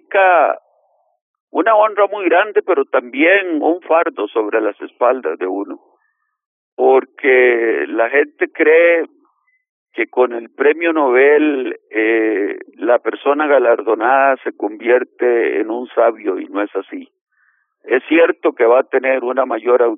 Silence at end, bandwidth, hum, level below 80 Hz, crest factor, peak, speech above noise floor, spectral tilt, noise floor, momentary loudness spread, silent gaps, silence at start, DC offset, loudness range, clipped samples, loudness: 0 s; 3.7 kHz; none; -84 dBFS; 14 dB; 0 dBFS; 52 dB; 0 dB/octave; -66 dBFS; 11 LU; 1.21-1.34 s, 1.40-1.47 s, 6.46-6.77 s, 9.69-9.86 s, 17.21-17.26 s; 0.1 s; under 0.1%; 4 LU; under 0.1%; -15 LUFS